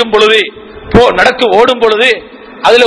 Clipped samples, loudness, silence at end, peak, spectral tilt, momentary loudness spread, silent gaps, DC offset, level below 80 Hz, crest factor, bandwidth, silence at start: 5%; -8 LUFS; 0 s; 0 dBFS; -4 dB/octave; 6 LU; none; under 0.1%; -32 dBFS; 8 dB; 11 kHz; 0 s